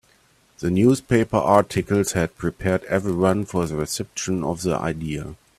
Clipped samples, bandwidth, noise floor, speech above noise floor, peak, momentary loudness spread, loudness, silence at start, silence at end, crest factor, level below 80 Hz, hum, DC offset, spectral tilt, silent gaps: under 0.1%; 14.5 kHz; -59 dBFS; 37 dB; -2 dBFS; 9 LU; -22 LUFS; 0.6 s; 0.25 s; 20 dB; -48 dBFS; none; under 0.1%; -6 dB/octave; none